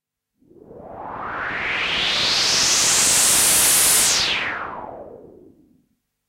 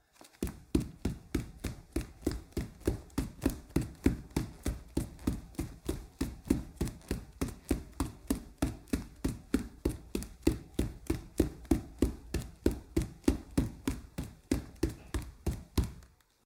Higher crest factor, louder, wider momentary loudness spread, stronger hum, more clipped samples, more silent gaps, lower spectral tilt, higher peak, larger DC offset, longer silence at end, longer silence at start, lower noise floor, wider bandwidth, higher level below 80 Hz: second, 16 dB vs 24 dB; first, -15 LUFS vs -37 LUFS; first, 19 LU vs 8 LU; neither; neither; neither; second, 1 dB/octave vs -6 dB/octave; first, -6 dBFS vs -12 dBFS; neither; first, 1 s vs 0.4 s; first, 0.7 s vs 0.25 s; first, -67 dBFS vs -58 dBFS; second, 16 kHz vs 18 kHz; second, -50 dBFS vs -42 dBFS